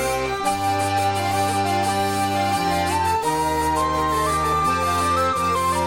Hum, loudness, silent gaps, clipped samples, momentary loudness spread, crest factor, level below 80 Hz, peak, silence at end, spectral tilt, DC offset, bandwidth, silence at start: none; -21 LUFS; none; under 0.1%; 2 LU; 12 dB; -40 dBFS; -10 dBFS; 0 s; -4 dB/octave; under 0.1%; 17 kHz; 0 s